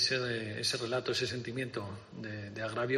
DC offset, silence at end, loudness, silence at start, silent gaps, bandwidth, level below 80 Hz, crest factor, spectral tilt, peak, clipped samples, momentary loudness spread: under 0.1%; 0 s; -35 LUFS; 0 s; none; 13 kHz; -68 dBFS; 18 dB; -3.5 dB/octave; -18 dBFS; under 0.1%; 11 LU